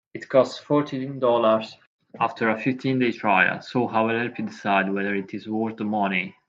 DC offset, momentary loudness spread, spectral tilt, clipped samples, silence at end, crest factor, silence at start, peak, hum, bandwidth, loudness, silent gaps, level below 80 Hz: under 0.1%; 9 LU; -6.5 dB/octave; under 0.1%; 0.15 s; 20 dB; 0.15 s; -4 dBFS; none; 7.8 kHz; -23 LUFS; 1.87-1.99 s; -72 dBFS